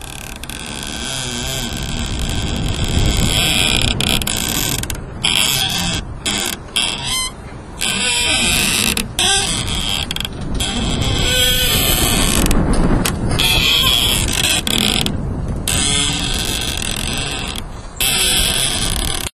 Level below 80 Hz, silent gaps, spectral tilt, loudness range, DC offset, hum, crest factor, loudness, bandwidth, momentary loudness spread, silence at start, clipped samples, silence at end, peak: -24 dBFS; none; -2.5 dB/octave; 4 LU; under 0.1%; none; 18 dB; -16 LUFS; 14 kHz; 10 LU; 0 s; under 0.1%; 0.1 s; 0 dBFS